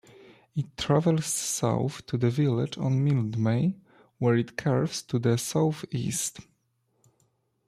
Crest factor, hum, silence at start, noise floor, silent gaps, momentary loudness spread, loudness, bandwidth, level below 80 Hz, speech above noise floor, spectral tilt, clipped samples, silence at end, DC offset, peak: 16 dB; none; 0.55 s; -73 dBFS; none; 7 LU; -27 LUFS; 14.5 kHz; -60 dBFS; 47 dB; -5.5 dB/octave; under 0.1%; 1.25 s; under 0.1%; -10 dBFS